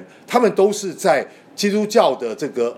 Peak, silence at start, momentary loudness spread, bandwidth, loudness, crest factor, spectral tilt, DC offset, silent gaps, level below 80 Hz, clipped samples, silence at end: -2 dBFS; 0 s; 8 LU; 16 kHz; -18 LUFS; 18 dB; -4.5 dB/octave; under 0.1%; none; -72 dBFS; under 0.1%; 0 s